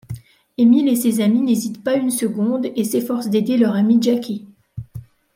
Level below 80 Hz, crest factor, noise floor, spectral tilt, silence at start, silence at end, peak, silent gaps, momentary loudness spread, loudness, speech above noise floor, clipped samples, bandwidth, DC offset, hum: -56 dBFS; 14 dB; -38 dBFS; -5.5 dB/octave; 0.1 s; 0.35 s; -4 dBFS; none; 20 LU; -18 LUFS; 21 dB; under 0.1%; 16.5 kHz; under 0.1%; none